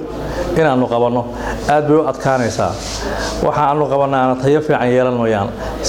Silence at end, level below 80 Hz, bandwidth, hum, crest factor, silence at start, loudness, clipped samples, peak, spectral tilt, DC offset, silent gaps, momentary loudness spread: 0 s; -34 dBFS; 16.5 kHz; none; 14 dB; 0 s; -16 LUFS; under 0.1%; 0 dBFS; -5.5 dB/octave; under 0.1%; none; 8 LU